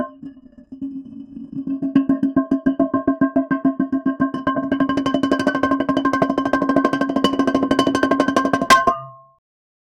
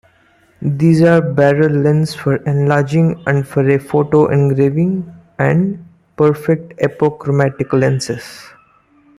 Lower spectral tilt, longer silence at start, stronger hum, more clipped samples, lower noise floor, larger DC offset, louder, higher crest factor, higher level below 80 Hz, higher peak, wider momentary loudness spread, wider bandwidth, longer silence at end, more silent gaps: second, -5 dB/octave vs -8 dB/octave; second, 0 s vs 0.6 s; neither; neither; second, -41 dBFS vs -52 dBFS; neither; second, -19 LUFS vs -14 LUFS; first, 20 dB vs 14 dB; about the same, -50 dBFS vs -52 dBFS; about the same, 0 dBFS vs -2 dBFS; first, 14 LU vs 9 LU; about the same, 13.5 kHz vs 12.5 kHz; about the same, 0.85 s vs 0.75 s; neither